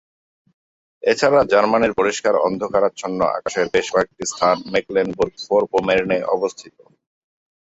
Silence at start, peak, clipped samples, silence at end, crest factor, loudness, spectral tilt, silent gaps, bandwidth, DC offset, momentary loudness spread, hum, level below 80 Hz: 1.05 s; -2 dBFS; under 0.1%; 1.1 s; 18 dB; -19 LUFS; -4 dB/octave; none; 8.2 kHz; under 0.1%; 7 LU; none; -54 dBFS